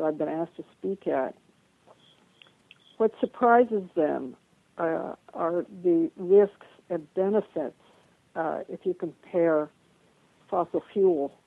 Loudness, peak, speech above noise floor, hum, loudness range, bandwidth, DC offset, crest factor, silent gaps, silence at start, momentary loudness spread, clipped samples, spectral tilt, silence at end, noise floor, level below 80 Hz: -27 LUFS; -8 dBFS; 36 dB; none; 4 LU; 4 kHz; under 0.1%; 20 dB; none; 0 s; 14 LU; under 0.1%; -9 dB/octave; 0.2 s; -63 dBFS; -74 dBFS